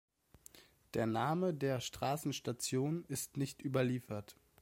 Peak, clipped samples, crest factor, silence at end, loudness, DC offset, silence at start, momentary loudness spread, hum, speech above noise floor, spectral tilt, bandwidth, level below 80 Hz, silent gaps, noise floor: -20 dBFS; under 0.1%; 18 dB; 0.3 s; -38 LUFS; under 0.1%; 0.55 s; 11 LU; none; 25 dB; -5 dB/octave; 16.5 kHz; -70 dBFS; none; -62 dBFS